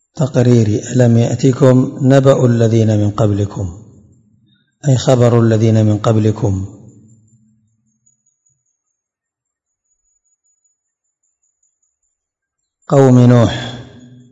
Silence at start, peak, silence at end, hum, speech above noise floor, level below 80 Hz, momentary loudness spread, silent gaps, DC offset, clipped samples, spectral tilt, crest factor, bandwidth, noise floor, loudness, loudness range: 0.15 s; 0 dBFS; 0.5 s; none; 70 dB; -50 dBFS; 12 LU; none; under 0.1%; 0.5%; -7.5 dB/octave; 14 dB; 7.8 kHz; -81 dBFS; -12 LUFS; 8 LU